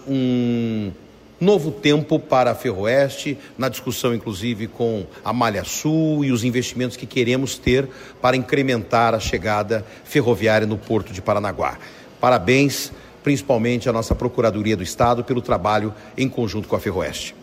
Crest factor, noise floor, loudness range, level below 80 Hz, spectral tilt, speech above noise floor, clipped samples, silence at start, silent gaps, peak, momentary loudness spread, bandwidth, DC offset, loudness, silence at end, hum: 16 dB; -42 dBFS; 2 LU; -42 dBFS; -5.5 dB/octave; 22 dB; under 0.1%; 0 s; none; -4 dBFS; 8 LU; 16 kHz; under 0.1%; -20 LUFS; 0 s; none